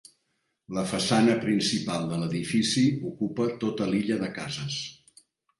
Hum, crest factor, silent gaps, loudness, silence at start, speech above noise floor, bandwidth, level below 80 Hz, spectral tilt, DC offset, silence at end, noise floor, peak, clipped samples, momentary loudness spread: none; 18 dB; none; -27 LUFS; 0.7 s; 50 dB; 11.5 kHz; -62 dBFS; -5 dB/octave; under 0.1%; 0.65 s; -76 dBFS; -10 dBFS; under 0.1%; 10 LU